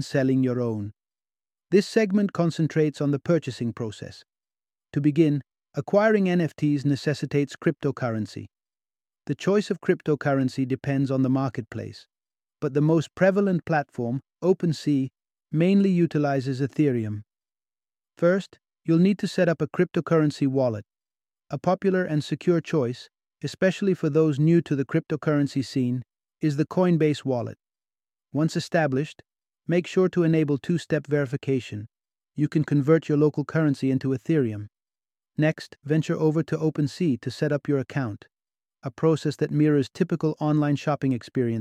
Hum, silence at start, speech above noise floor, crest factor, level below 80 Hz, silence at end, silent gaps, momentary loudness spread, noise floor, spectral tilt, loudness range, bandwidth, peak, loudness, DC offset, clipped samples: none; 0 s; over 67 dB; 18 dB; -66 dBFS; 0 s; none; 12 LU; under -90 dBFS; -7.5 dB/octave; 3 LU; 10.5 kHz; -6 dBFS; -24 LUFS; under 0.1%; under 0.1%